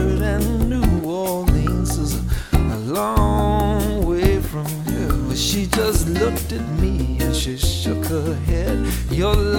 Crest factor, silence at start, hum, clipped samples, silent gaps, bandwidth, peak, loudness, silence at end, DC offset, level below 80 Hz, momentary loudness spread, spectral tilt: 18 dB; 0 s; none; under 0.1%; none; 18 kHz; 0 dBFS; -20 LUFS; 0 s; under 0.1%; -24 dBFS; 4 LU; -5.5 dB/octave